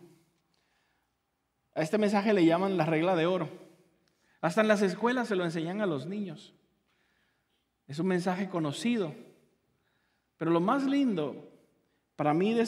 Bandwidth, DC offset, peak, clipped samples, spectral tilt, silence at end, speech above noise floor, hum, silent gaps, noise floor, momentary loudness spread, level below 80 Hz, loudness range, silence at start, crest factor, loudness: 13 kHz; under 0.1%; -10 dBFS; under 0.1%; -6.5 dB/octave; 0 s; 51 dB; none; none; -79 dBFS; 12 LU; -82 dBFS; 6 LU; 1.75 s; 22 dB; -29 LUFS